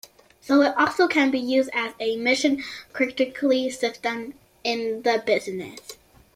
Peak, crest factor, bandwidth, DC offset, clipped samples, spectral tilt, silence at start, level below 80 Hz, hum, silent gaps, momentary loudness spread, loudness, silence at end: -6 dBFS; 18 dB; 15.5 kHz; under 0.1%; under 0.1%; -3.5 dB/octave; 0.45 s; -66 dBFS; none; none; 14 LU; -23 LUFS; 0.4 s